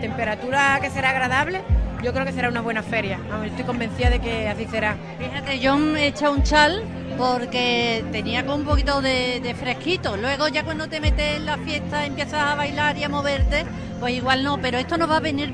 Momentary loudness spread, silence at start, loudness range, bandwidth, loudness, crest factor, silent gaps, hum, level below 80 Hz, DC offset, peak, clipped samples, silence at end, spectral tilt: 7 LU; 0 s; 3 LU; 11 kHz; -22 LUFS; 20 dB; none; none; -32 dBFS; 0.1%; -2 dBFS; under 0.1%; 0 s; -5 dB/octave